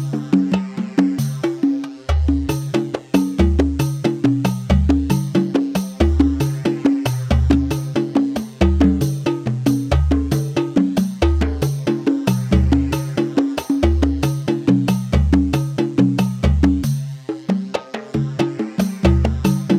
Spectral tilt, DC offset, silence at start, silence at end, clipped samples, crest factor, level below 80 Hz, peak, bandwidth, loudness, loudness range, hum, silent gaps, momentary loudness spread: -7 dB/octave; under 0.1%; 0 s; 0 s; under 0.1%; 16 dB; -24 dBFS; -2 dBFS; 15 kHz; -19 LUFS; 2 LU; none; none; 6 LU